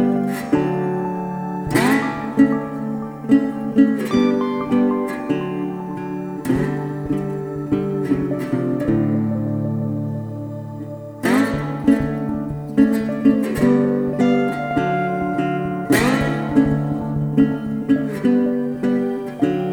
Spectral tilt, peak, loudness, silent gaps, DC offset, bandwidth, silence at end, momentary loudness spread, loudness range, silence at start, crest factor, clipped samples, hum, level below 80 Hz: -7 dB/octave; -4 dBFS; -20 LUFS; none; under 0.1%; 18.5 kHz; 0 s; 9 LU; 4 LU; 0 s; 16 dB; under 0.1%; none; -44 dBFS